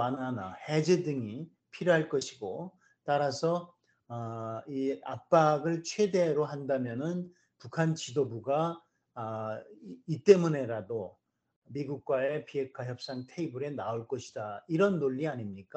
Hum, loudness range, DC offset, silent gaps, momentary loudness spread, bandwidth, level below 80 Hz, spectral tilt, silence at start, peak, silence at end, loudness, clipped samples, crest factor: none; 5 LU; under 0.1%; 11.56-11.62 s; 14 LU; 8.6 kHz; -76 dBFS; -6 dB/octave; 0 s; -8 dBFS; 0.15 s; -32 LUFS; under 0.1%; 24 dB